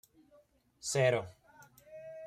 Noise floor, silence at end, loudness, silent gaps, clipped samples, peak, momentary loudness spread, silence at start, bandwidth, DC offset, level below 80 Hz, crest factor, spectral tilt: -67 dBFS; 0 s; -32 LUFS; none; under 0.1%; -16 dBFS; 22 LU; 0.85 s; 15.5 kHz; under 0.1%; -72 dBFS; 20 dB; -4 dB/octave